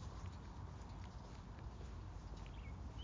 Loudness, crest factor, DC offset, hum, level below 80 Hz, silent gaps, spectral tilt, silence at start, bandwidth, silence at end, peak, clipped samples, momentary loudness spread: -53 LUFS; 12 dB; under 0.1%; none; -54 dBFS; none; -6 dB/octave; 0 s; 7.6 kHz; 0 s; -38 dBFS; under 0.1%; 2 LU